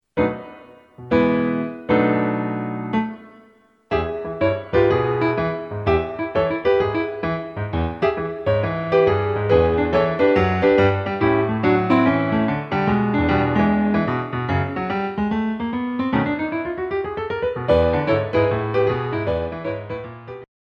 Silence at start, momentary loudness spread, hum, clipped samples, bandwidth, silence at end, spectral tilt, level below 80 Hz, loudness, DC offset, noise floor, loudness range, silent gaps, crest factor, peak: 0.15 s; 9 LU; none; under 0.1%; 6.8 kHz; 0.2 s; -9 dB/octave; -40 dBFS; -20 LUFS; under 0.1%; -54 dBFS; 4 LU; none; 18 dB; -2 dBFS